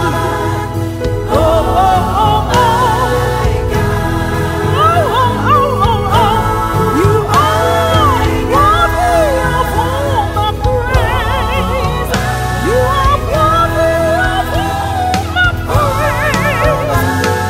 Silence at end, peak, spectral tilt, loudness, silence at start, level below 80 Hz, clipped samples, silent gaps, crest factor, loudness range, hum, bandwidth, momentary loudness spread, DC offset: 0 s; 0 dBFS; -5.5 dB/octave; -12 LUFS; 0 s; -22 dBFS; under 0.1%; none; 12 dB; 2 LU; none; 16 kHz; 5 LU; under 0.1%